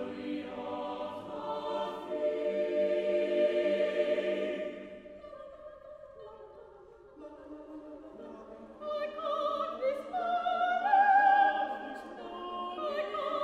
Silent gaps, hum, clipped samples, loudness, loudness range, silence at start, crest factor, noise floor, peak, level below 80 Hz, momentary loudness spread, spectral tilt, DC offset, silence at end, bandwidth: none; none; under 0.1%; -31 LUFS; 20 LU; 0 s; 18 dB; -55 dBFS; -14 dBFS; -70 dBFS; 23 LU; -5 dB/octave; under 0.1%; 0 s; 9.6 kHz